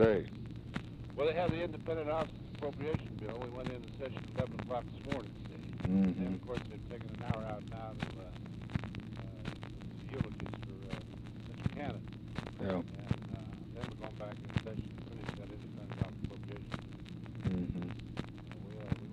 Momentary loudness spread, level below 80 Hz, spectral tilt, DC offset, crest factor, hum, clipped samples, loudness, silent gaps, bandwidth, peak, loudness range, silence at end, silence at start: 11 LU; -54 dBFS; -8 dB/octave; under 0.1%; 26 dB; none; under 0.1%; -41 LUFS; none; 10.5 kHz; -12 dBFS; 5 LU; 0 s; 0 s